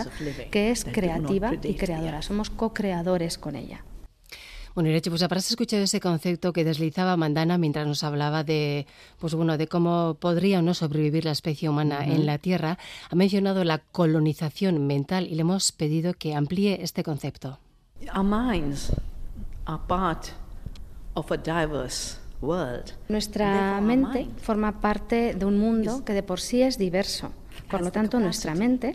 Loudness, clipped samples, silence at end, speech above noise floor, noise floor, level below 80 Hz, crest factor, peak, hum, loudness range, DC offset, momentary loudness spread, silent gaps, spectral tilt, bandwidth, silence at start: -26 LUFS; under 0.1%; 0 s; 21 dB; -46 dBFS; -42 dBFS; 16 dB; -10 dBFS; none; 5 LU; under 0.1%; 12 LU; none; -5.5 dB/octave; 14.5 kHz; 0 s